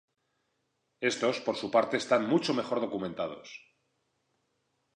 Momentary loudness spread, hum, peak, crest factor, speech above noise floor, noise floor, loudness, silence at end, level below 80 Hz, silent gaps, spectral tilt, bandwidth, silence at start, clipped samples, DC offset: 12 LU; none; -12 dBFS; 20 dB; 49 dB; -79 dBFS; -30 LUFS; 1.4 s; -74 dBFS; none; -4.5 dB/octave; 10.5 kHz; 1 s; under 0.1%; under 0.1%